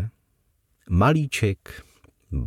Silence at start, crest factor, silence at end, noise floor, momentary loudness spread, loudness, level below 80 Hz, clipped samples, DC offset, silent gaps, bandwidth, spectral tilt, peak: 0 s; 18 dB; 0 s; -68 dBFS; 21 LU; -23 LUFS; -38 dBFS; under 0.1%; under 0.1%; none; 15.5 kHz; -6.5 dB/octave; -8 dBFS